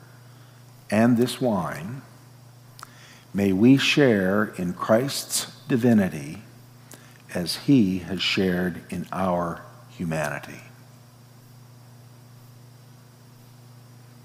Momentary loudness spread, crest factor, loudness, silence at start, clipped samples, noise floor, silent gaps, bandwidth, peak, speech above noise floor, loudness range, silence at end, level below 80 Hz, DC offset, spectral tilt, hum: 21 LU; 20 dB; -23 LUFS; 0.9 s; under 0.1%; -49 dBFS; none; 16 kHz; -6 dBFS; 27 dB; 11 LU; 3.55 s; -66 dBFS; under 0.1%; -5 dB/octave; 60 Hz at -45 dBFS